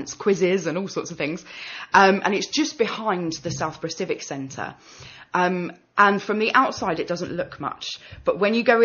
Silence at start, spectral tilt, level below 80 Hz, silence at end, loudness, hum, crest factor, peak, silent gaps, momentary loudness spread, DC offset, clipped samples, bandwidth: 0 s; -3 dB/octave; -58 dBFS; 0 s; -23 LUFS; none; 20 dB; -2 dBFS; none; 14 LU; under 0.1%; under 0.1%; 7 kHz